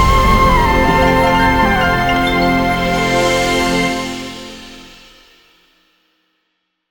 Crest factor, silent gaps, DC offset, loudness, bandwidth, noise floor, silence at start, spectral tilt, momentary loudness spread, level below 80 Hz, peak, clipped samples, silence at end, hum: 14 dB; none; under 0.1%; -13 LUFS; 19 kHz; -69 dBFS; 0 s; -5 dB/octave; 15 LU; -24 dBFS; 0 dBFS; under 0.1%; 2.05 s; none